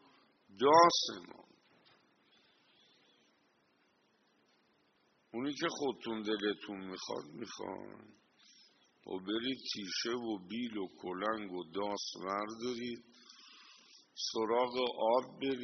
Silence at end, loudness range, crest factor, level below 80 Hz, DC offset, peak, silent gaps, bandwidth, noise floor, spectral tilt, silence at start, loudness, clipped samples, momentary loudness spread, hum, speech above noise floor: 0 s; 10 LU; 26 dB; -82 dBFS; under 0.1%; -12 dBFS; none; 6.4 kHz; -74 dBFS; -2 dB/octave; 0.5 s; -35 LUFS; under 0.1%; 17 LU; none; 38 dB